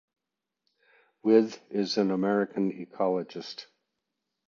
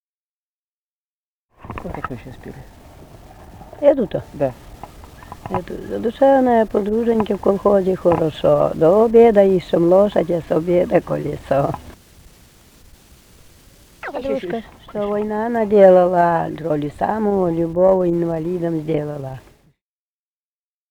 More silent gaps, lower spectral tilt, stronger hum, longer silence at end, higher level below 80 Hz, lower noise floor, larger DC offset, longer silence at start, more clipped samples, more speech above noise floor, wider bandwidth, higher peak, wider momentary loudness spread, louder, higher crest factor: neither; second, -6 dB/octave vs -8 dB/octave; neither; second, 0.85 s vs 1.5 s; second, -78 dBFS vs -44 dBFS; about the same, -87 dBFS vs under -90 dBFS; neither; second, 1.25 s vs 1.65 s; neither; second, 60 dB vs over 73 dB; second, 7.2 kHz vs 19 kHz; second, -8 dBFS vs 0 dBFS; second, 16 LU vs 19 LU; second, -28 LUFS vs -17 LUFS; about the same, 20 dB vs 18 dB